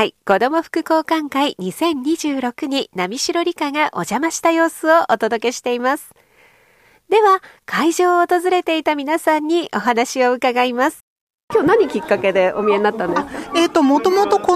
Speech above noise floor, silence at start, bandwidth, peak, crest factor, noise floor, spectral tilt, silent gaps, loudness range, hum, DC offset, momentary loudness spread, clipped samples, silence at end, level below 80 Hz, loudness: 37 dB; 0 s; 15 kHz; -2 dBFS; 16 dB; -53 dBFS; -3.5 dB/octave; 11.01-11.27 s, 11.34-11.48 s; 3 LU; none; under 0.1%; 6 LU; under 0.1%; 0 s; -58 dBFS; -17 LUFS